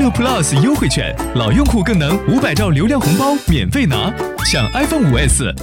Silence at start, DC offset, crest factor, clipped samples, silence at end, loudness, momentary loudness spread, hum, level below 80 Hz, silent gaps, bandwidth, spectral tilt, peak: 0 s; under 0.1%; 12 dB; under 0.1%; 0 s; -14 LUFS; 4 LU; none; -24 dBFS; none; 17 kHz; -5 dB/octave; -2 dBFS